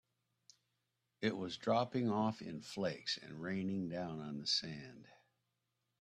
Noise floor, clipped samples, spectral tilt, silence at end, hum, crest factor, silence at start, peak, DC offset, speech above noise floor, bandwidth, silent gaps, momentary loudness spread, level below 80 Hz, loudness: -86 dBFS; under 0.1%; -5 dB/octave; 0.9 s; none; 20 dB; 1.2 s; -22 dBFS; under 0.1%; 47 dB; 10.5 kHz; none; 11 LU; -78 dBFS; -39 LUFS